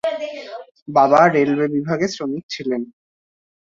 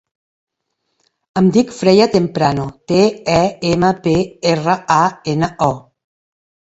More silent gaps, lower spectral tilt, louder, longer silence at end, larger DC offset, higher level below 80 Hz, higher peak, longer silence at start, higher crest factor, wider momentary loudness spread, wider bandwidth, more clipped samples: first, 0.82-0.86 s, 2.43-2.49 s vs none; about the same, -6 dB/octave vs -6 dB/octave; second, -18 LUFS vs -15 LUFS; second, 0.75 s vs 0.9 s; neither; second, -62 dBFS vs -46 dBFS; about the same, -2 dBFS vs 0 dBFS; second, 0.05 s vs 1.35 s; about the same, 18 dB vs 16 dB; first, 21 LU vs 7 LU; about the same, 7.6 kHz vs 8 kHz; neither